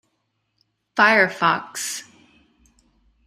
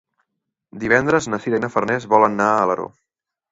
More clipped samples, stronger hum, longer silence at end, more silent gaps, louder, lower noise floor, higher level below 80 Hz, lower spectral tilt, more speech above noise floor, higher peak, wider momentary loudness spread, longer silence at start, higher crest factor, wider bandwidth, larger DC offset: neither; neither; first, 1.25 s vs 0.65 s; neither; about the same, -19 LUFS vs -18 LUFS; second, -73 dBFS vs -82 dBFS; second, -66 dBFS vs -56 dBFS; second, -2.5 dB/octave vs -5.5 dB/octave; second, 54 dB vs 63 dB; about the same, -2 dBFS vs -2 dBFS; first, 14 LU vs 9 LU; first, 0.95 s vs 0.75 s; about the same, 22 dB vs 18 dB; first, 15.5 kHz vs 8 kHz; neither